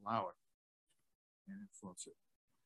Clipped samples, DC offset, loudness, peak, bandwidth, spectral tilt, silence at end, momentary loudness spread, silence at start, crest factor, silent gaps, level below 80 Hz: under 0.1%; under 0.1%; -48 LUFS; -24 dBFS; 12 kHz; -4.5 dB/octave; 0.55 s; 15 LU; 0 s; 26 dB; 0.54-0.87 s, 1.15-1.45 s; -88 dBFS